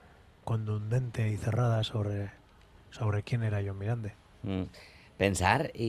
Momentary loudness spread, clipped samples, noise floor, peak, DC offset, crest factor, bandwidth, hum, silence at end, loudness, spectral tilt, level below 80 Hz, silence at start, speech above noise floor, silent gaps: 16 LU; under 0.1%; -57 dBFS; -8 dBFS; under 0.1%; 24 dB; 13.5 kHz; none; 0 s; -32 LUFS; -6 dB/octave; -56 dBFS; 0.45 s; 27 dB; none